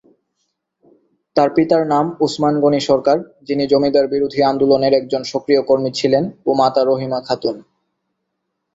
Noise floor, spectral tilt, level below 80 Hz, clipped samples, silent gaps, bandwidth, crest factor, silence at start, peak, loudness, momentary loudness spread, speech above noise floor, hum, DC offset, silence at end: -74 dBFS; -6 dB/octave; -56 dBFS; under 0.1%; none; 8 kHz; 16 dB; 1.35 s; -2 dBFS; -16 LUFS; 7 LU; 59 dB; none; under 0.1%; 1.15 s